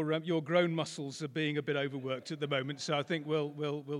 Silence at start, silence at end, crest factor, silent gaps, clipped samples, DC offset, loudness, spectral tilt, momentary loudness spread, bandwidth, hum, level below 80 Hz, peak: 0 s; 0 s; 18 dB; none; under 0.1%; under 0.1%; -34 LUFS; -5.5 dB/octave; 8 LU; 11.5 kHz; none; -86 dBFS; -16 dBFS